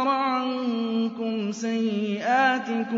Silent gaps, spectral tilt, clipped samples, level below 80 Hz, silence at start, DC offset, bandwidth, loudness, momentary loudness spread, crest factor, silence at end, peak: none; -5 dB/octave; under 0.1%; -78 dBFS; 0 s; under 0.1%; 7.6 kHz; -25 LUFS; 7 LU; 16 dB; 0 s; -10 dBFS